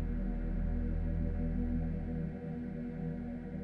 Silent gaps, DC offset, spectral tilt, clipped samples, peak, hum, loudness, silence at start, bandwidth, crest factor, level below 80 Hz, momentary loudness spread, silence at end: none; under 0.1%; -11 dB/octave; under 0.1%; -22 dBFS; none; -38 LUFS; 0 s; 3.2 kHz; 12 dB; -38 dBFS; 5 LU; 0 s